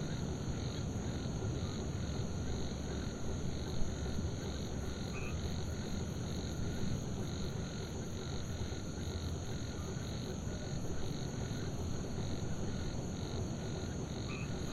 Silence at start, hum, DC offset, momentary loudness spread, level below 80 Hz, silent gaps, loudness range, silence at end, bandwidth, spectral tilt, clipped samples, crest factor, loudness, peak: 0 s; none; 0.1%; 2 LU; -46 dBFS; none; 1 LU; 0 s; 13.5 kHz; -5.5 dB/octave; under 0.1%; 18 dB; -41 LUFS; -22 dBFS